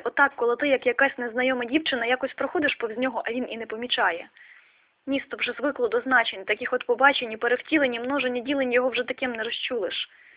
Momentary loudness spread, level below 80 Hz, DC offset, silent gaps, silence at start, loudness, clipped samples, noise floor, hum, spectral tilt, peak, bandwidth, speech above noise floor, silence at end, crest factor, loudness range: 8 LU; -66 dBFS; under 0.1%; none; 0 s; -25 LUFS; under 0.1%; -58 dBFS; none; -6.5 dB/octave; -6 dBFS; 4 kHz; 33 dB; 0.3 s; 20 dB; 4 LU